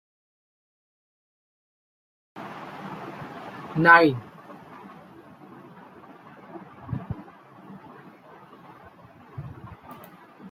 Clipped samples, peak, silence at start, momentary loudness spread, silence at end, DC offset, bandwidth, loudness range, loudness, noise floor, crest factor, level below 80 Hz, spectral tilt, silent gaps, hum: under 0.1%; -2 dBFS; 2.35 s; 29 LU; 0 s; under 0.1%; 16 kHz; 20 LU; -21 LUFS; -50 dBFS; 28 dB; -62 dBFS; -7 dB/octave; none; none